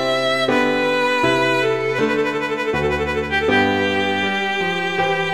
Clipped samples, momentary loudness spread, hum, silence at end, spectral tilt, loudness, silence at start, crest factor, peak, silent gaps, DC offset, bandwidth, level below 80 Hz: under 0.1%; 4 LU; none; 0 s; -4.5 dB/octave; -18 LUFS; 0 s; 14 dB; -4 dBFS; none; 0.6%; 15.5 kHz; -42 dBFS